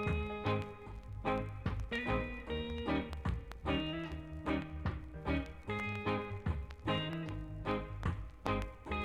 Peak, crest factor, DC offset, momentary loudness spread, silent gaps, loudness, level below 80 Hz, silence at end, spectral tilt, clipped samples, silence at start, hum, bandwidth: -18 dBFS; 20 dB; under 0.1%; 5 LU; none; -39 LUFS; -46 dBFS; 0 s; -7 dB/octave; under 0.1%; 0 s; none; 11.5 kHz